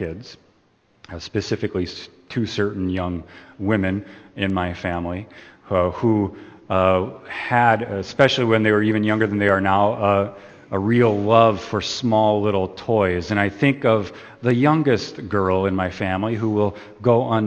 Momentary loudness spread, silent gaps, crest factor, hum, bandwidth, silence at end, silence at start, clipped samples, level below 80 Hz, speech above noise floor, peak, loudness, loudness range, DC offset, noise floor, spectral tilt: 12 LU; none; 20 dB; none; 8.6 kHz; 0 s; 0 s; under 0.1%; -52 dBFS; 40 dB; 0 dBFS; -20 LUFS; 7 LU; under 0.1%; -60 dBFS; -6.5 dB/octave